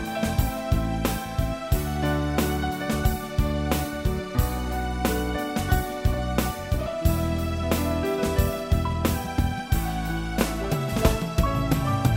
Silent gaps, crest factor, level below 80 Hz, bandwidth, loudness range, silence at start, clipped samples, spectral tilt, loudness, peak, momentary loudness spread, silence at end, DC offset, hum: none; 20 dB; -30 dBFS; 16.5 kHz; 1 LU; 0 s; under 0.1%; -6 dB/octave; -26 LUFS; -6 dBFS; 4 LU; 0 s; 0.1%; none